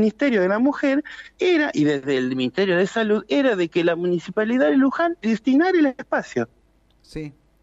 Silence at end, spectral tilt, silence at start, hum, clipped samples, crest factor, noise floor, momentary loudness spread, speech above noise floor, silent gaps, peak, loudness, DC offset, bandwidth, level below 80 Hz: 0.3 s; -6 dB/octave; 0 s; none; under 0.1%; 14 dB; -59 dBFS; 10 LU; 38 dB; none; -8 dBFS; -20 LUFS; under 0.1%; 8 kHz; -58 dBFS